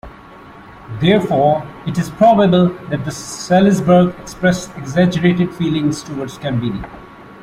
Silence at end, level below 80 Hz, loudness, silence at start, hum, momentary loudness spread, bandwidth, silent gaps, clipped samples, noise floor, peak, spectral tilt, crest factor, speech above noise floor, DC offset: 0 s; -44 dBFS; -16 LUFS; 0.05 s; none; 12 LU; 12.5 kHz; none; under 0.1%; -38 dBFS; -2 dBFS; -6.5 dB/octave; 14 dB; 24 dB; under 0.1%